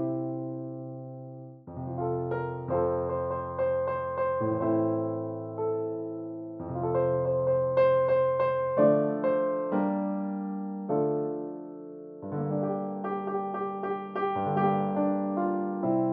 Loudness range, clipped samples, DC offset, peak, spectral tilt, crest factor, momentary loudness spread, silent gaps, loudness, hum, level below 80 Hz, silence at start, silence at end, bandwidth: 7 LU; under 0.1%; under 0.1%; -10 dBFS; -8.5 dB/octave; 18 dB; 14 LU; none; -29 LUFS; none; -62 dBFS; 0 s; 0 s; 4.5 kHz